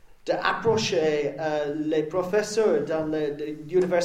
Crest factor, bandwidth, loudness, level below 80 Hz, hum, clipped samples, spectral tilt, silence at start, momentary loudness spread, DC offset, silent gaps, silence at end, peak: 18 dB; 13.5 kHz; -25 LUFS; -58 dBFS; none; under 0.1%; -5 dB/octave; 0.05 s; 5 LU; under 0.1%; none; 0 s; -6 dBFS